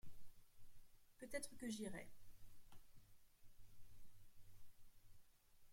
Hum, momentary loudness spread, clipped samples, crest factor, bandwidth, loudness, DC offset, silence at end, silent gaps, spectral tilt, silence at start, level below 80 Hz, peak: none; 12 LU; under 0.1%; 18 dB; 16.5 kHz; -52 LUFS; under 0.1%; 0 s; none; -4 dB/octave; 0.05 s; -70 dBFS; -34 dBFS